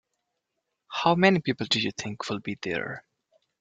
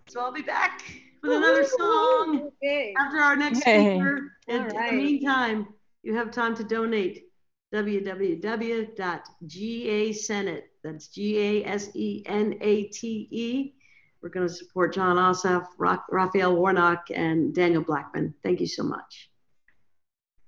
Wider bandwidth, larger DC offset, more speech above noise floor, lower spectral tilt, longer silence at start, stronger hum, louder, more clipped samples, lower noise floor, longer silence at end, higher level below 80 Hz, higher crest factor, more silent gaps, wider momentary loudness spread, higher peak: first, 9 kHz vs 7.8 kHz; neither; first, 56 dB vs 45 dB; about the same, -5 dB/octave vs -5 dB/octave; first, 0.9 s vs 0.1 s; neither; about the same, -26 LUFS vs -25 LUFS; neither; first, -82 dBFS vs -70 dBFS; second, 0.6 s vs 1.25 s; first, -66 dBFS vs -72 dBFS; about the same, 22 dB vs 20 dB; neither; about the same, 14 LU vs 12 LU; about the same, -6 dBFS vs -6 dBFS